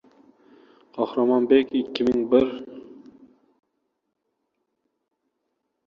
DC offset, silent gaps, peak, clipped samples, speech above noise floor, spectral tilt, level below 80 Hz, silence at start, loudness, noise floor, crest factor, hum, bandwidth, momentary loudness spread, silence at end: under 0.1%; none; -6 dBFS; under 0.1%; 56 dB; -7 dB/octave; -62 dBFS; 0.95 s; -22 LUFS; -77 dBFS; 22 dB; none; 6.8 kHz; 21 LU; 2.95 s